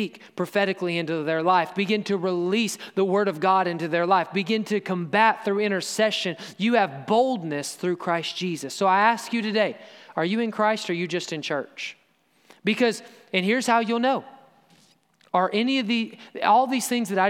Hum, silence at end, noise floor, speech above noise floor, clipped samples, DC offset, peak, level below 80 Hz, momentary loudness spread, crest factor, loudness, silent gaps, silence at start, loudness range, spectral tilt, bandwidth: none; 0 s; -63 dBFS; 39 dB; under 0.1%; under 0.1%; -4 dBFS; -82 dBFS; 9 LU; 20 dB; -24 LUFS; none; 0 s; 4 LU; -4.5 dB/octave; 16 kHz